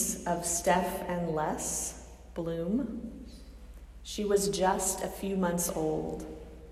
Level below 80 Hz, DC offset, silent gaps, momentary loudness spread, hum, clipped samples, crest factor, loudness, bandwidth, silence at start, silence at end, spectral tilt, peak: -50 dBFS; under 0.1%; none; 20 LU; none; under 0.1%; 20 dB; -31 LUFS; 16 kHz; 0 s; 0 s; -4 dB/octave; -12 dBFS